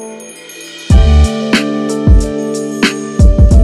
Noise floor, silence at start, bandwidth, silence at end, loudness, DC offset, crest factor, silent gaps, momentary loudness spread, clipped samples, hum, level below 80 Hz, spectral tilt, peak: -30 dBFS; 0 s; 12 kHz; 0 s; -11 LUFS; under 0.1%; 10 dB; none; 19 LU; under 0.1%; none; -12 dBFS; -6 dB/octave; 0 dBFS